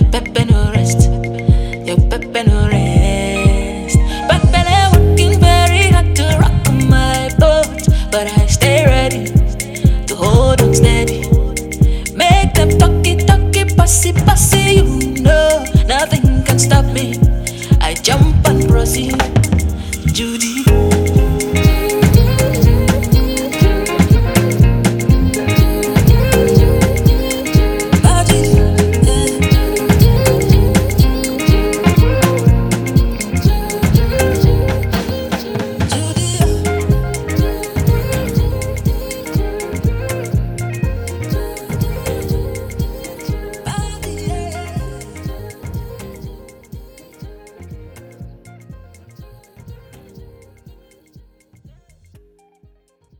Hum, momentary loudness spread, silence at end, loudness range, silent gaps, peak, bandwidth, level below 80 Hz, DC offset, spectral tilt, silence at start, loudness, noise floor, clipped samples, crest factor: none; 11 LU; 3.45 s; 11 LU; none; 0 dBFS; 19.5 kHz; -18 dBFS; under 0.1%; -5.5 dB/octave; 0 s; -13 LUFS; -53 dBFS; under 0.1%; 12 dB